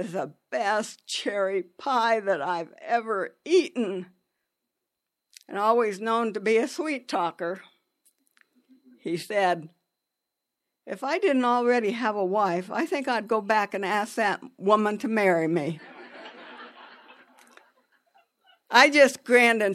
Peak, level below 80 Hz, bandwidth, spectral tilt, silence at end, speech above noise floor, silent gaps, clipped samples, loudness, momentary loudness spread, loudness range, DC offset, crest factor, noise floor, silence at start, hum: -2 dBFS; -82 dBFS; 14 kHz; -4 dB/octave; 0 s; 60 dB; none; under 0.1%; -25 LUFS; 17 LU; 6 LU; under 0.1%; 24 dB; -85 dBFS; 0 s; none